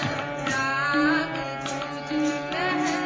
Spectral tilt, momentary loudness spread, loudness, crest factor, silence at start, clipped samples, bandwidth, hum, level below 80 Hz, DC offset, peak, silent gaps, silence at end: -4.5 dB/octave; 8 LU; -25 LUFS; 16 dB; 0 s; under 0.1%; 8 kHz; none; -56 dBFS; under 0.1%; -10 dBFS; none; 0 s